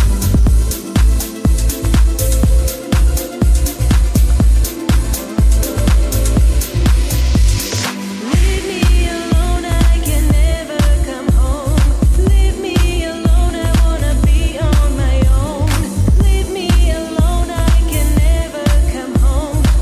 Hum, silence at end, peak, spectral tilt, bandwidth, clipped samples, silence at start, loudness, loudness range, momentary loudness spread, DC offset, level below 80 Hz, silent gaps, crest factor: none; 0 s; -2 dBFS; -5.5 dB/octave; 15.5 kHz; under 0.1%; 0 s; -15 LUFS; 1 LU; 3 LU; under 0.1%; -12 dBFS; none; 10 dB